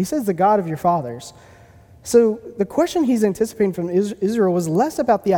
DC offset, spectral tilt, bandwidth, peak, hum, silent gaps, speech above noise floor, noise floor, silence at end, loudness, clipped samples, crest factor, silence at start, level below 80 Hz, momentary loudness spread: under 0.1%; -6.5 dB/octave; 19 kHz; -2 dBFS; none; none; 28 dB; -47 dBFS; 0 s; -19 LUFS; under 0.1%; 16 dB; 0 s; -54 dBFS; 8 LU